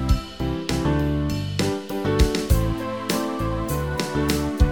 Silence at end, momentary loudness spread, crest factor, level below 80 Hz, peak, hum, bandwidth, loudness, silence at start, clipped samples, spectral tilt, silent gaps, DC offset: 0 s; 5 LU; 18 dB; -28 dBFS; -6 dBFS; none; 19 kHz; -24 LUFS; 0 s; under 0.1%; -6 dB/octave; none; under 0.1%